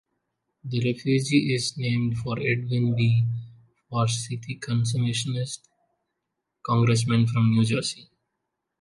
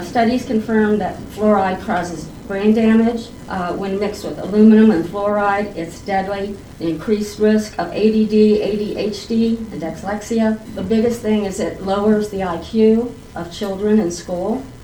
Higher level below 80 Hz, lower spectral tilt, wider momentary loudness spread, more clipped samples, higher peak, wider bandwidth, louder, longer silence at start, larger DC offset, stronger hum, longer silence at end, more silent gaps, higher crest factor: second, -58 dBFS vs -42 dBFS; about the same, -5.5 dB/octave vs -6.5 dB/octave; about the same, 12 LU vs 12 LU; neither; second, -8 dBFS vs -2 dBFS; second, 11.5 kHz vs 19 kHz; second, -25 LUFS vs -18 LUFS; first, 0.65 s vs 0 s; neither; neither; first, 0.75 s vs 0 s; neither; about the same, 18 dB vs 16 dB